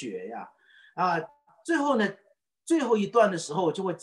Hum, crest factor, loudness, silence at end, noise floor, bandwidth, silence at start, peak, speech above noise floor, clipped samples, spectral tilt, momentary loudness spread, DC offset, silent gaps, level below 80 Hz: none; 18 dB; -27 LUFS; 0.05 s; -57 dBFS; 12 kHz; 0 s; -10 dBFS; 32 dB; under 0.1%; -5 dB/octave; 20 LU; under 0.1%; none; -78 dBFS